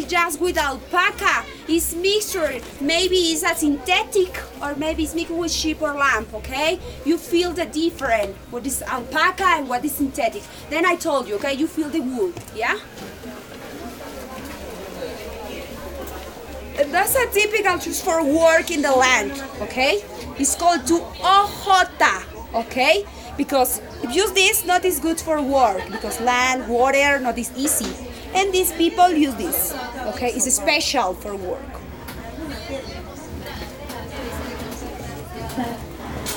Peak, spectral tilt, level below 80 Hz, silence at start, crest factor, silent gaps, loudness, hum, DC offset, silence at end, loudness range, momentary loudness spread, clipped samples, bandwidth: -2 dBFS; -2.5 dB/octave; -42 dBFS; 0 s; 18 dB; none; -20 LUFS; none; under 0.1%; 0 s; 12 LU; 16 LU; under 0.1%; over 20 kHz